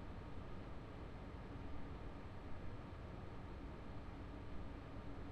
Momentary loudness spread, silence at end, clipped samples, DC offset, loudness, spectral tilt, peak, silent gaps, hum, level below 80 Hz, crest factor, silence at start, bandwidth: 1 LU; 0 s; under 0.1%; under 0.1%; -53 LUFS; -7.5 dB/octave; -36 dBFS; none; none; -56 dBFS; 14 dB; 0 s; 10.5 kHz